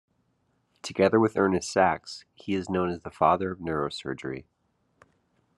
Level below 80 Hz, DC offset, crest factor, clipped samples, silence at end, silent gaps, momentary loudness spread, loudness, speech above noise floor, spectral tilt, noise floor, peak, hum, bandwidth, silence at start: -62 dBFS; under 0.1%; 22 dB; under 0.1%; 1.15 s; none; 15 LU; -26 LUFS; 45 dB; -5.5 dB/octave; -72 dBFS; -6 dBFS; none; 11.5 kHz; 0.85 s